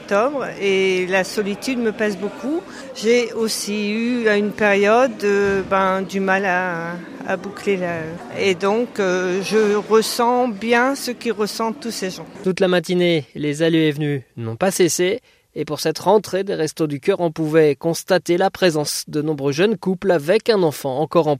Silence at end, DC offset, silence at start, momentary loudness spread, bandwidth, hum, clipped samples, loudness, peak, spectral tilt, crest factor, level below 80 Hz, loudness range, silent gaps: 0 s; under 0.1%; 0 s; 9 LU; 15.5 kHz; none; under 0.1%; -19 LUFS; -2 dBFS; -4.5 dB/octave; 16 dB; -58 dBFS; 3 LU; none